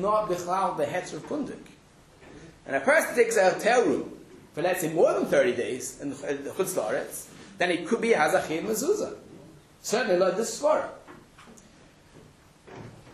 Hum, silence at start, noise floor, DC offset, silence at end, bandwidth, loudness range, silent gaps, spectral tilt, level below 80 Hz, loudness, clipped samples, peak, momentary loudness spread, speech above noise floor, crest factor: none; 0 s; -54 dBFS; under 0.1%; 0 s; 13.5 kHz; 5 LU; none; -4 dB/octave; -64 dBFS; -26 LUFS; under 0.1%; -10 dBFS; 18 LU; 29 dB; 18 dB